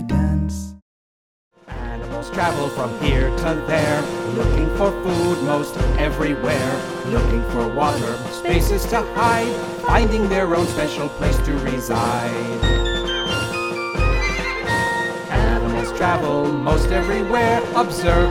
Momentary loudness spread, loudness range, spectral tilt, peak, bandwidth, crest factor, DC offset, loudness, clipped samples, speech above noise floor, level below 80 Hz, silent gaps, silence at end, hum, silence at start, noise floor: 6 LU; 2 LU; -5.5 dB/octave; -2 dBFS; 16.5 kHz; 16 dB; under 0.1%; -20 LUFS; under 0.1%; over 71 dB; -26 dBFS; 0.82-1.51 s; 0 s; none; 0 s; under -90 dBFS